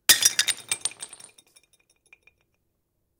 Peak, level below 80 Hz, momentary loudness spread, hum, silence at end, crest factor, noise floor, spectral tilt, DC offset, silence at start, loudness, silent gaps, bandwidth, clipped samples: -4 dBFS; -64 dBFS; 23 LU; none; 2.15 s; 24 dB; -75 dBFS; 2.5 dB/octave; under 0.1%; 0.1 s; -22 LUFS; none; 19 kHz; under 0.1%